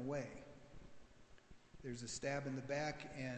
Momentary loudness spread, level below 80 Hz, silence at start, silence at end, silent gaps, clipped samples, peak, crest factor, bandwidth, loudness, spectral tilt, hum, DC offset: 23 LU; -68 dBFS; 0 s; 0 s; none; under 0.1%; -28 dBFS; 18 dB; 8.8 kHz; -45 LUFS; -5 dB/octave; none; under 0.1%